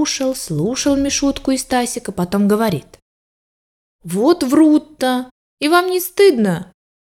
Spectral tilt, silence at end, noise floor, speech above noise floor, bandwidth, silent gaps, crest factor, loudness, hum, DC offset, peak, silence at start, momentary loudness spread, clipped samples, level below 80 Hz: -4.5 dB/octave; 0.35 s; under -90 dBFS; over 74 dB; 17 kHz; 3.02-3.99 s, 5.31-5.57 s; 16 dB; -16 LUFS; none; under 0.1%; 0 dBFS; 0 s; 10 LU; under 0.1%; -46 dBFS